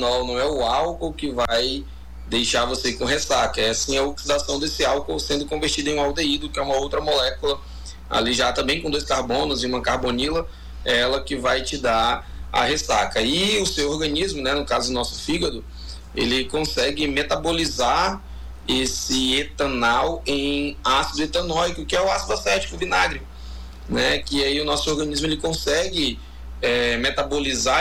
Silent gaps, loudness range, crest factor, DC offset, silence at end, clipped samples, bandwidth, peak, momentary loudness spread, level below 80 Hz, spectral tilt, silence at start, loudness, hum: none; 2 LU; 14 dB; under 0.1%; 0 s; under 0.1%; 19 kHz; -8 dBFS; 7 LU; -36 dBFS; -3 dB/octave; 0 s; -22 LUFS; none